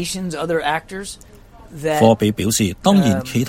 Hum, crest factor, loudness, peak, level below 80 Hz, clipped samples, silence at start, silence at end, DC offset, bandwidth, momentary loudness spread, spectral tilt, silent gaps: none; 18 dB; -17 LUFS; 0 dBFS; -44 dBFS; under 0.1%; 0 s; 0 s; under 0.1%; 16.5 kHz; 16 LU; -5 dB/octave; none